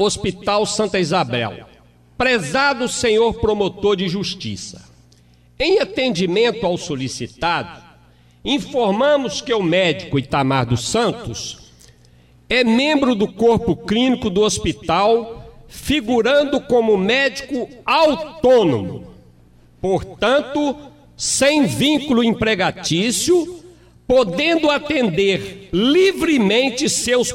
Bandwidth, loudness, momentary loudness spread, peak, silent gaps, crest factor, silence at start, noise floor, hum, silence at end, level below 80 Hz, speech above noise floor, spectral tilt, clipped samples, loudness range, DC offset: 16 kHz; -17 LUFS; 10 LU; -4 dBFS; none; 14 dB; 0 s; -51 dBFS; 60 Hz at -50 dBFS; 0 s; -44 dBFS; 33 dB; -4 dB/octave; under 0.1%; 4 LU; under 0.1%